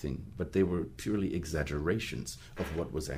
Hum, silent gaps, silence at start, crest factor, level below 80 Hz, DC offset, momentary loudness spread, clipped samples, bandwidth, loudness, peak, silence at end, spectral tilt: none; none; 0 s; 18 dB; -48 dBFS; under 0.1%; 9 LU; under 0.1%; 15.5 kHz; -34 LUFS; -16 dBFS; 0 s; -6 dB/octave